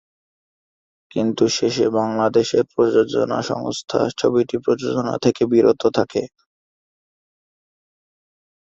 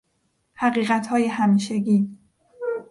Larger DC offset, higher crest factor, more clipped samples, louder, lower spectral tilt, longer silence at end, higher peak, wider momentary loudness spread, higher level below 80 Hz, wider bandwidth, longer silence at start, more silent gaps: neither; about the same, 18 dB vs 14 dB; neither; first, -19 LUFS vs -22 LUFS; about the same, -5.5 dB/octave vs -6.5 dB/octave; first, 2.35 s vs 0.05 s; first, -2 dBFS vs -8 dBFS; second, 7 LU vs 10 LU; first, -58 dBFS vs -66 dBFS; second, 7.8 kHz vs 11.5 kHz; first, 1.15 s vs 0.6 s; neither